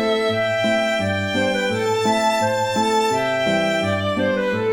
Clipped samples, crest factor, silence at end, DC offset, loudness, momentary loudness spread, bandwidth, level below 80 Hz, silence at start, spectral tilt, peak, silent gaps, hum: under 0.1%; 12 dB; 0 s; under 0.1%; -19 LUFS; 2 LU; 18.5 kHz; -54 dBFS; 0 s; -4.5 dB/octave; -6 dBFS; none; none